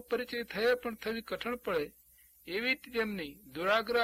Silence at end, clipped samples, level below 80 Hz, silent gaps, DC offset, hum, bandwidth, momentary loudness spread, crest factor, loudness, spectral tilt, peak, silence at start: 0 s; under 0.1%; -64 dBFS; none; under 0.1%; none; 16 kHz; 10 LU; 20 dB; -34 LUFS; -4.5 dB/octave; -16 dBFS; 0 s